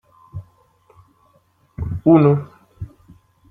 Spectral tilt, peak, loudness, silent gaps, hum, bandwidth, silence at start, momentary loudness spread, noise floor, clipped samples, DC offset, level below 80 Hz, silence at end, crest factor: -11.5 dB/octave; -2 dBFS; -16 LUFS; none; none; 4.6 kHz; 0.35 s; 25 LU; -59 dBFS; under 0.1%; under 0.1%; -46 dBFS; 0.65 s; 20 dB